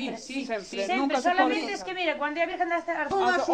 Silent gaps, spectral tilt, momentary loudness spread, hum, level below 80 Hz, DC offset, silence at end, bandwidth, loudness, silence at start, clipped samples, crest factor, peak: none; -3 dB/octave; 8 LU; none; -64 dBFS; under 0.1%; 0 s; 10 kHz; -27 LUFS; 0 s; under 0.1%; 18 dB; -10 dBFS